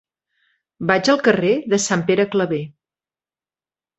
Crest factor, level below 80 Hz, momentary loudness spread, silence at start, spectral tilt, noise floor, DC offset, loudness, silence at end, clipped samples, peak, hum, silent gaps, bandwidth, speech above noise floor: 18 dB; -60 dBFS; 11 LU; 0.8 s; -4.5 dB/octave; under -90 dBFS; under 0.1%; -18 LUFS; 1.3 s; under 0.1%; -2 dBFS; none; none; 8.2 kHz; over 72 dB